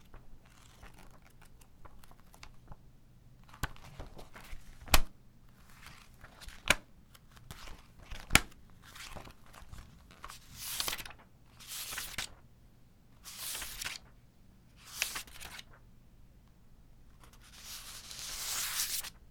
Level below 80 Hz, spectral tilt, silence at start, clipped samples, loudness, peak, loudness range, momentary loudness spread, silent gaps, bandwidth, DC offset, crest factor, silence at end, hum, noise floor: -46 dBFS; -1.5 dB/octave; 0 s; under 0.1%; -36 LUFS; -2 dBFS; 15 LU; 27 LU; none; over 20 kHz; under 0.1%; 38 dB; 0 s; none; -60 dBFS